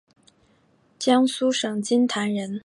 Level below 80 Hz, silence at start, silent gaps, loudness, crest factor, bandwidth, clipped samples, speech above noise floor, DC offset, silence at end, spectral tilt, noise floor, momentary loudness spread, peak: -74 dBFS; 1 s; none; -22 LUFS; 18 dB; 11.5 kHz; under 0.1%; 40 dB; under 0.1%; 0.05 s; -4 dB/octave; -61 dBFS; 6 LU; -6 dBFS